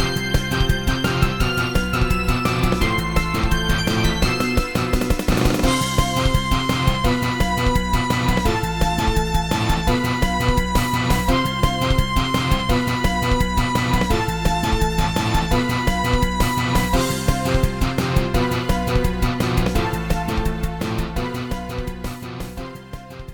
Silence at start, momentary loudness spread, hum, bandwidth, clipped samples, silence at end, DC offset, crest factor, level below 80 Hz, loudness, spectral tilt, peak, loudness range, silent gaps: 0 s; 6 LU; none; 19.5 kHz; under 0.1%; 0 s; 0.4%; 16 dB; -24 dBFS; -20 LUFS; -5 dB/octave; -4 dBFS; 2 LU; none